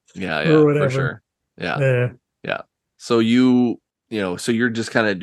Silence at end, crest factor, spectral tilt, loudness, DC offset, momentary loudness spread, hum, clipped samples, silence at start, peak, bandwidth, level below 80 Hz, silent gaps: 0 s; 18 dB; -6.5 dB/octave; -19 LUFS; under 0.1%; 14 LU; none; under 0.1%; 0.15 s; 0 dBFS; 12.5 kHz; -60 dBFS; none